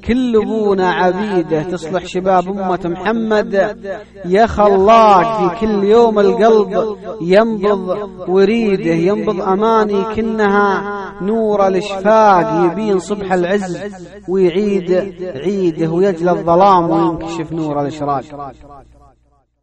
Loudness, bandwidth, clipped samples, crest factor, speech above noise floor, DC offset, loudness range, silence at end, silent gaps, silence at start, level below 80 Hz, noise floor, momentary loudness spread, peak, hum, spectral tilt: -14 LUFS; 9 kHz; under 0.1%; 14 dB; 42 dB; under 0.1%; 5 LU; 0.8 s; none; 0 s; -42 dBFS; -56 dBFS; 12 LU; 0 dBFS; none; -7 dB/octave